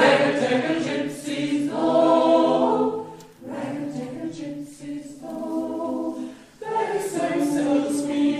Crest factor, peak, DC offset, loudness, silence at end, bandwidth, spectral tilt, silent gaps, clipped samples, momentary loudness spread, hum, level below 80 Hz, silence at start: 18 dB; -6 dBFS; under 0.1%; -23 LUFS; 0 s; 13.5 kHz; -5 dB/octave; none; under 0.1%; 17 LU; none; -66 dBFS; 0 s